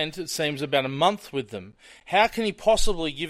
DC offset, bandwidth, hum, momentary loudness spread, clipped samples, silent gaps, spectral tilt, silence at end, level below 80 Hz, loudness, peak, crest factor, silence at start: under 0.1%; 15.5 kHz; none; 11 LU; under 0.1%; none; -3.5 dB/octave; 0 s; -38 dBFS; -24 LUFS; -6 dBFS; 20 dB; 0 s